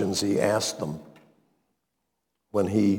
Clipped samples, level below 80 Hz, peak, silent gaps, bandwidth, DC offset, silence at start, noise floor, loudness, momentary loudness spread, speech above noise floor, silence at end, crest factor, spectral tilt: under 0.1%; -64 dBFS; -8 dBFS; none; 19 kHz; under 0.1%; 0 s; -80 dBFS; -26 LUFS; 11 LU; 55 dB; 0 s; 18 dB; -5 dB/octave